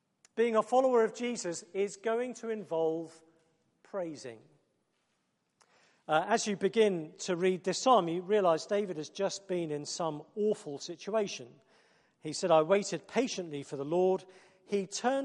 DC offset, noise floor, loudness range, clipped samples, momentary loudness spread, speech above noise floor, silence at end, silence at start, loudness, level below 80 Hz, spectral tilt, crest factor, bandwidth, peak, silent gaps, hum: under 0.1%; -78 dBFS; 8 LU; under 0.1%; 13 LU; 47 dB; 0 s; 0.35 s; -32 LUFS; -82 dBFS; -4.5 dB/octave; 20 dB; 11 kHz; -12 dBFS; none; none